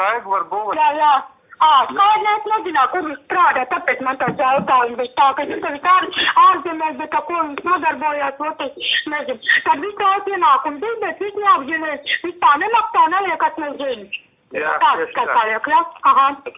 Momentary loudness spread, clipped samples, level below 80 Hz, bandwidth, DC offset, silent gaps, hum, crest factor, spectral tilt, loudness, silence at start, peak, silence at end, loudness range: 9 LU; under 0.1%; -62 dBFS; 3.9 kHz; under 0.1%; none; none; 14 dB; -6.5 dB/octave; -17 LUFS; 0 s; -2 dBFS; 0.05 s; 2 LU